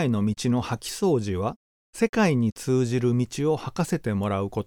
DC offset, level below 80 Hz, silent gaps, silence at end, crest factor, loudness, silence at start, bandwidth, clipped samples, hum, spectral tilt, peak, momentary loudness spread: under 0.1%; -54 dBFS; 1.56-1.93 s, 2.09-2.13 s, 2.52-2.56 s; 0.05 s; 16 dB; -25 LUFS; 0 s; 18.5 kHz; under 0.1%; none; -6.5 dB/octave; -8 dBFS; 6 LU